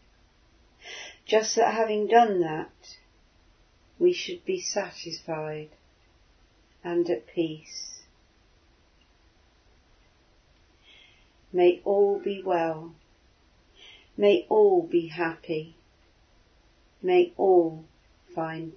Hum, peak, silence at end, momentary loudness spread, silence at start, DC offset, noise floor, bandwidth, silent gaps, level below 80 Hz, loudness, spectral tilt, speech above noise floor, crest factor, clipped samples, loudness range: none; -6 dBFS; 0.05 s; 19 LU; 0.85 s; under 0.1%; -62 dBFS; 6.6 kHz; none; -66 dBFS; -25 LUFS; -4.5 dB/octave; 37 dB; 22 dB; under 0.1%; 8 LU